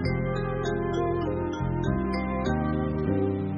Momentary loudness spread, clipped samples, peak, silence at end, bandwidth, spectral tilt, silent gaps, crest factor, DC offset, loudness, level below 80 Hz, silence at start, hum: 2 LU; under 0.1%; -14 dBFS; 0 s; 6.8 kHz; -7 dB/octave; none; 14 dB; under 0.1%; -28 LUFS; -40 dBFS; 0 s; none